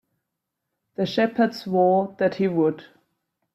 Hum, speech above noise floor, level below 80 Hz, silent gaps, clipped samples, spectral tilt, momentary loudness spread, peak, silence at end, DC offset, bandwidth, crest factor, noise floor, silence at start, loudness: none; 60 dB; -68 dBFS; none; under 0.1%; -7.5 dB/octave; 9 LU; -8 dBFS; 0.7 s; under 0.1%; 13.5 kHz; 16 dB; -82 dBFS; 1 s; -22 LUFS